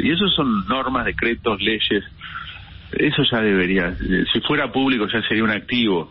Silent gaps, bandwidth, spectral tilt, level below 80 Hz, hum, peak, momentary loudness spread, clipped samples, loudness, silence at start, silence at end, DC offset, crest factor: none; 5.8 kHz; -10.5 dB/octave; -40 dBFS; none; -6 dBFS; 12 LU; under 0.1%; -19 LUFS; 0 s; 0.05 s; under 0.1%; 14 dB